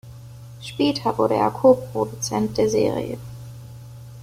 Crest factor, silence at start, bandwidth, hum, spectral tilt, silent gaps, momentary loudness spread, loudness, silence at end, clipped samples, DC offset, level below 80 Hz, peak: 18 dB; 0.05 s; 16 kHz; none; -5.5 dB/octave; none; 23 LU; -21 LUFS; 0 s; under 0.1%; under 0.1%; -50 dBFS; -4 dBFS